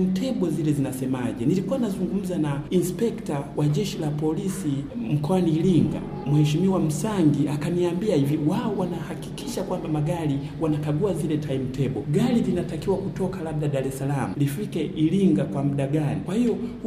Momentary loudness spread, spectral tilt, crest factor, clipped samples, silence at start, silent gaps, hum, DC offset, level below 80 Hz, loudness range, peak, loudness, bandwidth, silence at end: 7 LU; -7.5 dB/octave; 16 dB; under 0.1%; 0 s; none; none; under 0.1%; -48 dBFS; 3 LU; -8 dBFS; -25 LUFS; 15.5 kHz; 0 s